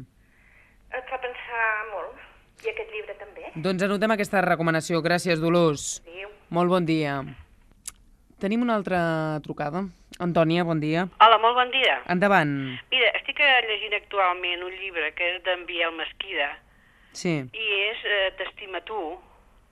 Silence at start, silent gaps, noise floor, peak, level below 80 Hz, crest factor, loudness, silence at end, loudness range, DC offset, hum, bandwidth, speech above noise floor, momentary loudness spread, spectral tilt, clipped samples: 0 s; none; -58 dBFS; -4 dBFS; -58 dBFS; 22 dB; -24 LUFS; 0.5 s; 8 LU; under 0.1%; none; 13.5 kHz; 33 dB; 16 LU; -4.5 dB/octave; under 0.1%